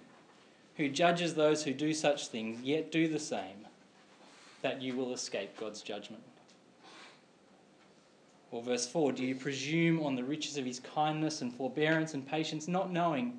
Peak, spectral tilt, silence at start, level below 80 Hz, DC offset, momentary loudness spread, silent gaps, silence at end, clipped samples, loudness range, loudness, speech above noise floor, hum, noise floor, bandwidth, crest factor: -14 dBFS; -4.5 dB/octave; 0 s; under -90 dBFS; under 0.1%; 13 LU; none; 0 s; under 0.1%; 10 LU; -34 LUFS; 29 dB; none; -63 dBFS; 10.5 kHz; 20 dB